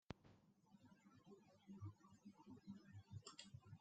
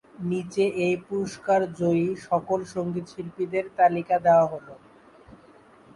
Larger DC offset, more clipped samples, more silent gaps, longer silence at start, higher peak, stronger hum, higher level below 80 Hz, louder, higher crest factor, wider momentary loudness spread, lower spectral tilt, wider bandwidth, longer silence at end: neither; neither; neither; about the same, 0.1 s vs 0.2 s; second, -34 dBFS vs -8 dBFS; neither; second, -84 dBFS vs -62 dBFS; second, -62 LUFS vs -25 LUFS; first, 28 dB vs 18 dB; about the same, 9 LU vs 11 LU; second, -5.5 dB/octave vs -7 dB/octave; second, 8.8 kHz vs 11.5 kHz; second, 0 s vs 0.6 s